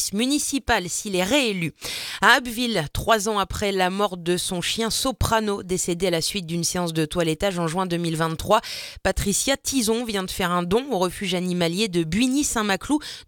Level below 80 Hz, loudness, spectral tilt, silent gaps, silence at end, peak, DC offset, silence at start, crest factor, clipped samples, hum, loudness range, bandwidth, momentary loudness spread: -42 dBFS; -23 LUFS; -3.5 dB/octave; none; 0.05 s; 0 dBFS; under 0.1%; 0 s; 22 dB; under 0.1%; none; 2 LU; 19 kHz; 4 LU